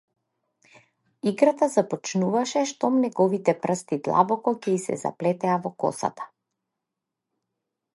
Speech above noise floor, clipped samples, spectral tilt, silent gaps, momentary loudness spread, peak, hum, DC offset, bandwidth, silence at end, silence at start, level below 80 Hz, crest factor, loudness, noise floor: 61 dB; under 0.1%; -5.5 dB/octave; none; 8 LU; -4 dBFS; none; under 0.1%; 11.5 kHz; 1.7 s; 1.25 s; -74 dBFS; 20 dB; -24 LUFS; -85 dBFS